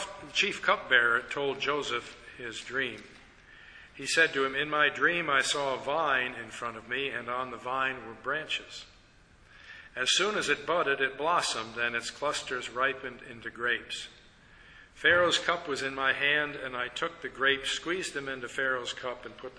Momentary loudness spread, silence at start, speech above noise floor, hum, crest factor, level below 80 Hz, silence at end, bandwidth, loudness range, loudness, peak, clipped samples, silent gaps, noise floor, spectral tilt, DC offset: 14 LU; 0 s; 28 dB; none; 22 dB; -62 dBFS; 0 s; 11 kHz; 5 LU; -29 LUFS; -8 dBFS; under 0.1%; none; -59 dBFS; -2 dB/octave; under 0.1%